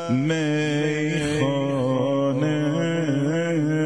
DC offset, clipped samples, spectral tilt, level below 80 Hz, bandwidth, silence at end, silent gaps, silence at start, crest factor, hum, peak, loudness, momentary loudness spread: 0.3%; under 0.1%; -6.5 dB/octave; -56 dBFS; 10.5 kHz; 0 s; none; 0 s; 12 dB; none; -10 dBFS; -23 LUFS; 1 LU